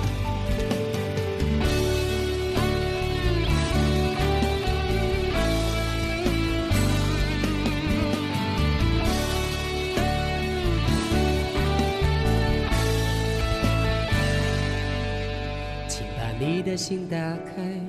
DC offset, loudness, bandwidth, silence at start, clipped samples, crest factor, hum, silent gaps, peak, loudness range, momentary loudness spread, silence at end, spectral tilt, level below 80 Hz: under 0.1%; -25 LUFS; 14 kHz; 0 s; under 0.1%; 12 dB; none; none; -12 dBFS; 2 LU; 5 LU; 0 s; -5.5 dB/octave; -30 dBFS